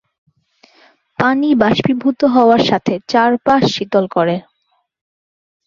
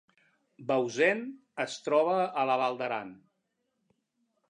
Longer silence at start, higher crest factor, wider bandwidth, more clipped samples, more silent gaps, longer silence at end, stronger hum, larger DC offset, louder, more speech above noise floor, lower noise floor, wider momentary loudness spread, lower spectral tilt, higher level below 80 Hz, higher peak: first, 1.2 s vs 0.6 s; second, 14 dB vs 20 dB; second, 7.4 kHz vs 10.5 kHz; neither; neither; about the same, 1.25 s vs 1.35 s; neither; neither; first, -14 LUFS vs -29 LUFS; about the same, 52 dB vs 51 dB; second, -65 dBFS vs -80 dBFS; second, 6 LU vs 12 LU; first, -6 dB/octave vs -4.5 dB/octave; first, -54 dBFS vs -86 dBFS; first, -2 dBFS vs -12 dBFS